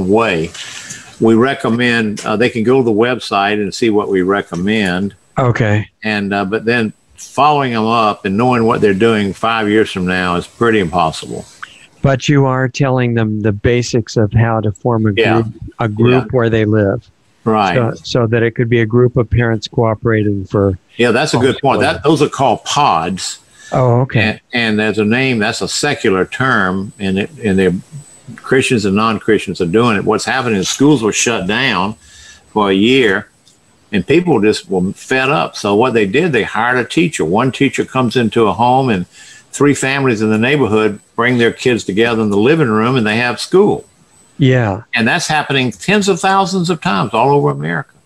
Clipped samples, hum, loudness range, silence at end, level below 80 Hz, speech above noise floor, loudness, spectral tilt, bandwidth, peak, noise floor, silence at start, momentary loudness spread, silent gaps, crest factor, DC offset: under 0.1%; none; 2 LU; 0.2 s; -44 dBFS; 37 dB; -14 LUFS; -5.5 dB/octave; 12.5 kHz; 0 dBFS; -50 dBFS; 0 s; 6 LU; none; 14 dB; 0.1%